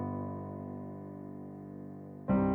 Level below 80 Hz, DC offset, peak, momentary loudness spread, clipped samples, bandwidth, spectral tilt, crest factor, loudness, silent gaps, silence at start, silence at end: -56 dBFS; under 0.1%; -18 dBFS; 13 LU; under 0.1%; 3.2 kHz; -12 dB/octave; 18 dB; -40 LUFS; none; 0 s; 0 s